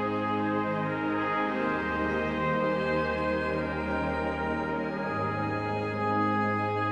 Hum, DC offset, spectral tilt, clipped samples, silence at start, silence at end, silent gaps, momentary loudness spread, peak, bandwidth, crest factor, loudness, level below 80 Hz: none; under 0.1%; -7.5 dB/octave; under 0.1%; 0 s; 0 s; none; 3 LU; -16 dBFS; 9.8 kHz; 12 dB; -29 LUFS; -48 dBFS